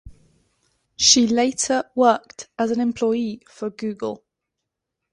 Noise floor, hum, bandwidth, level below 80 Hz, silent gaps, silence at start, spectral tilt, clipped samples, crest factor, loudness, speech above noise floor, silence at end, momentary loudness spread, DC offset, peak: -82 dBFS; none; 11 kHz; -56 dBFS; none; 0.05 s; -2 dB/octave; under 0.1%; 22 dB; -20 LUFS; 61 dB; 0.95 s; 17 LU; under 0.1%; 0 dBFS